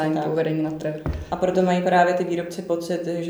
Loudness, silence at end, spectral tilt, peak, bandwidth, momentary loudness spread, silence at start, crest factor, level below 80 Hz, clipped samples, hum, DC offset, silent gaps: -23 LUFS; 0 s; -6.5 dB/octave; -6 dBFS; over 20 kHz; 10 LU; 0 s; 16 dB; -42 dBFS; under 0.1%; none; under 0.1%; none